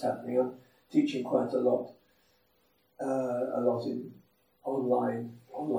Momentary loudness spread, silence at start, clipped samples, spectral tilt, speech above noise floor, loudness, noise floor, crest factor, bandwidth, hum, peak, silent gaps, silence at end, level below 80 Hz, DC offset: 11 LU; 0 s; under 0.1%; -7.5 dB/octave; 40 dB; -31 LUFS; -70 dBFS; 20 dB; 13 kHz; none; -12 dBFS; none; 0 s; -82 dBFS; under 0.1%